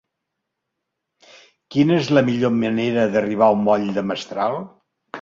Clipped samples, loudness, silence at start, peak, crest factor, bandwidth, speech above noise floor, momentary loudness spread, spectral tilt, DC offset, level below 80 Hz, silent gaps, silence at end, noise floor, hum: under 0.1%; -19 LUFS; 1.7 s; -2 dBFS; 18 dB; 7.6 kHz; 61 dB; 9 LU; -7 dB/octave; under 0.1%; -60 dBFS; none; 0 s; -79 dBFS; none